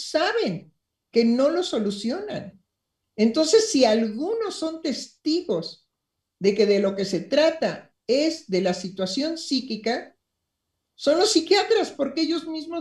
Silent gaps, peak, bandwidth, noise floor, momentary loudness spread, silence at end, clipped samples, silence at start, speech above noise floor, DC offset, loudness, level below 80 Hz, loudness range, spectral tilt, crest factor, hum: none; -6 dBFS; 12.5 kHz; -81 dBFS; 10 LU; 0 s; under 0.1%; 0 s; 59 dB; under 0.1%; -23 LUFS; -68 dBFS; 3 LU; -4 dB/octave; 18 dB; none